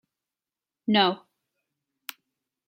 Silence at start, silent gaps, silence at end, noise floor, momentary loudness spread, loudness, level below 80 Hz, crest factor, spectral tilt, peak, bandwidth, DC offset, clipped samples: 0.9 s; none; 1.5 s; under -90 dBFS; 20 LU; -24 LUFS; -76 dBFS; 24 dB; -5 dB/octave; -8 dBFS; 16.5 kHz; under 0.1%; under 0.1%